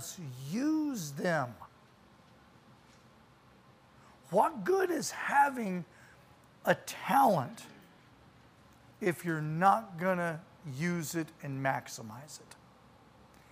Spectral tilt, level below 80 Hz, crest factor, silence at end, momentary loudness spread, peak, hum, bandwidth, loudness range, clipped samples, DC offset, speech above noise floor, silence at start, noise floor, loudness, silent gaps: -5 dB/octave; -74 dBFS; 24 dB; 1 s; 17 LU; -12 dBFS; none; 15.5 kHz; 7 LU; under 0.1%; under 0.1%; 29 dB; 0 s; -61 dBFS; -32 LUFS; none